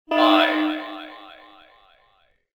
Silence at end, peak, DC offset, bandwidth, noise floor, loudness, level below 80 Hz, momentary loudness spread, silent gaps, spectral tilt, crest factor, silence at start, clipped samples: 1.25 s; -4 dBFS; under 0.1%; over 20 kHz; -62 dBFS; -19 LUFS; -70 dBFS; 23 LU; none; -3 dB/octave; 20 dB; 0.1 s; under 0.1%